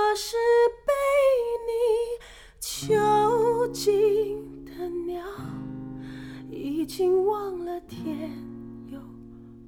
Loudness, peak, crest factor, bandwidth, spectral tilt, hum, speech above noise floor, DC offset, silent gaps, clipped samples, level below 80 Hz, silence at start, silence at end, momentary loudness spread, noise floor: -25 LUFS; -12 dBFS; 14 dB; 18 kHz; -4.5 dB/octave; none; 19 dB; under 0.1%; none; under 0.1%; -54 dBFS; 0 s; 0 s; 19 LU; -45 dBFS